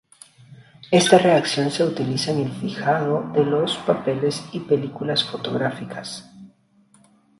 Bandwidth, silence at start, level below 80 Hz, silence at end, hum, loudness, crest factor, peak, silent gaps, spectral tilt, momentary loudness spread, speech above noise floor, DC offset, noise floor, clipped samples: 11.5 kHz; 0.5 s; -64 dBFS; 0.95 s; none; -21 LUFS; 22 dB; 0 dBFS; none; -5 dB/octave; 13 LU; 37 dB; under 0.1%; -57 dBFS; under 0.1%